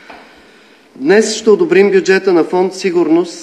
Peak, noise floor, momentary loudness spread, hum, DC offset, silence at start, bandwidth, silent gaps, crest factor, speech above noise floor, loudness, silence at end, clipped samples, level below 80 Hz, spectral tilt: 0 dBFS; -44 dBFS; 5 LU; none; under 0.1%; 0.1 s; 10.5 kHz; none; 12 dB; 33 dB; -11 LUFS; 0 s; under 0.1%; -64 dBFS; -4.5 dB/octave